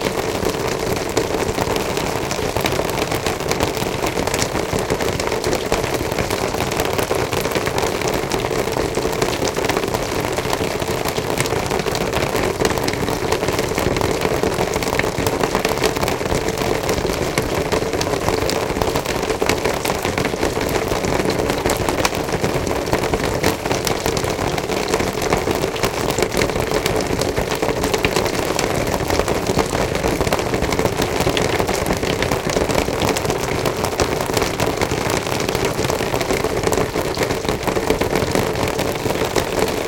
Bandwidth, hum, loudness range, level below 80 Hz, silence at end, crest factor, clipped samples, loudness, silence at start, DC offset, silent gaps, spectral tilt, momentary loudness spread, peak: 17 kHz; none; 1 LU; -34 dBFS; 0 s; 20 dB; under 0.1%; -20 LUFS; 0 s; under 0.1%; none; -4 dB/octave; 2 LU; 0 dBFS